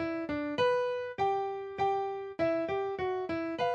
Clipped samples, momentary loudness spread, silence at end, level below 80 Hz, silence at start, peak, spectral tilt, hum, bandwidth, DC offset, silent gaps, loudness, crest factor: under 0.1%; 5 LU; 0 s; -66 dBFS; 0 s; -16 dBFS; -6 dB/octave; none; 8.2 kHz; under 0.1%; none; -32 LUFS; 16 dB